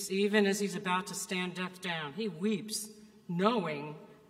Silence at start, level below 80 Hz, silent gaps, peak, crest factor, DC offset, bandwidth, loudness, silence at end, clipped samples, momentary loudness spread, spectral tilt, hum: 0 s; -80 dBFS; none; -12 dBFS; 22 dB; under 0.1%; 16 kHz; -33 LUFS; 0.15 s; under 0.1%; 12 LU; -4 dB/octave; none